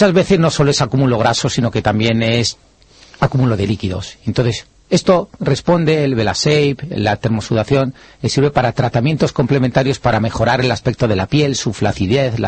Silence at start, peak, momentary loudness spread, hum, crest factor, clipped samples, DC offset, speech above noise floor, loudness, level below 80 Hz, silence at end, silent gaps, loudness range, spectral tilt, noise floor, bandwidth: 0 s; -2 dBFS; 6 LU; none; 12 dB; under 0.1%; under 0.1%; 30 dB; -16 LUFS; -40 dBFS; 0 s; none; 2 LU; -5.5 dB/octave; -45 dBFS; 8.8 kHz